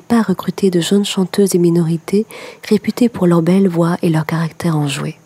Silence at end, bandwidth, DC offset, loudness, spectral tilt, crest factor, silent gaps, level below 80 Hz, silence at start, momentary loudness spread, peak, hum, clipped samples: 0.15 s; 15.5 kHz; under 0.1%; -15 LUFS; -6.5 dB/octave; 12 dB; none; -56 dBFS; 0.1 s; 6 LU; -2 dBFS; none; under 0.1%